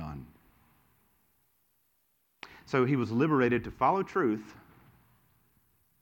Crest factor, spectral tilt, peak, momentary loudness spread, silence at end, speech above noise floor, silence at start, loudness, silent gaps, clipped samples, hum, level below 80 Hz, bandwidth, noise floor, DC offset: 20 dB; -8 dB/octave; -12 dBFS; 23 LU; 1.5 s; 46 dB; 0 s; -29 LUFS; none; under 0.1%; none; -60 dBFS; 17.5 kHz; -74 dBFS; under 0.1%